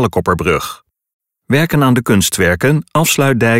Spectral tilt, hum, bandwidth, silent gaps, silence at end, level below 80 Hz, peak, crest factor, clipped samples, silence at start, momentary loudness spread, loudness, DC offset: -5 dB/octave; none; 16.5 kHz; 1.13-1.20 s; 0 s; -38 dBFS; -2 dBFS; 12 dB; under 0.1%; 0 s; 5 LU; -13 LUFS; under 0.1%